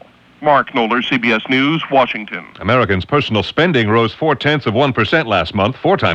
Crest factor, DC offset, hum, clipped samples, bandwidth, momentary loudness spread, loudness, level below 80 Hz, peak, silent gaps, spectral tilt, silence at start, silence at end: 14 dB; under 0.1%; none; under 0.1%; 8.4 kHz; 4 LU; -15 LUFS; -46 dBFS; 0 dBFS; none; -7 dB/octave; 0.4 s; 0 s